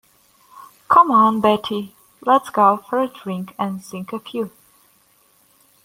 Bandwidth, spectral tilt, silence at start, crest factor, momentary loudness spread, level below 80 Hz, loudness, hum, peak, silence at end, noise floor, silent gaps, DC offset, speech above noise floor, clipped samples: 16.5 kHz; -6 dB/octave; 0.55 s; 18 dB; 16 LU; -62 dBFS; -18 LUFS; none; -2 dBFS; 1.35 s; -57 dBFS; none; under 0.1%; 38 dB; under 0.1%